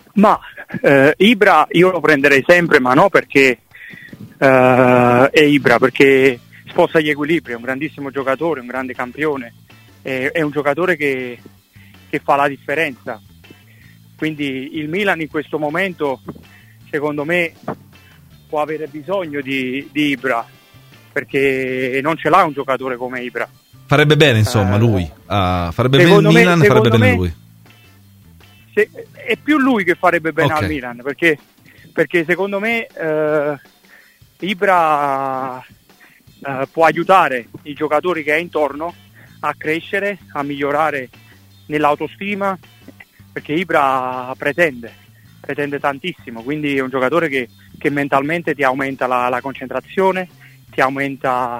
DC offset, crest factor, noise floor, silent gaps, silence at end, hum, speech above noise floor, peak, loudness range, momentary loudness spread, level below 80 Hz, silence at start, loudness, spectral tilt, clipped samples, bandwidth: under 0.1%; 16 dB; -48 dBFS; none; 0 s; none; 33 dB; 0 dBFS; 9 LU; 15 LU; -48 dBFS; 0.15 s; -16 LUFS; -6 dB/octave; under 0.1%; 16 kHz